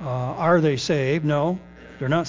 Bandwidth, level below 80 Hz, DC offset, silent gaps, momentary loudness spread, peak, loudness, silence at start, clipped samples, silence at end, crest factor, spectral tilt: 7.6 kHz; -52 dBFS; under 0.1%; none; 9 LU; -6 dBFS; -22 LUFS; 0 s; under 0.1%; 0 s; 16 dB; -6.5 dB/octave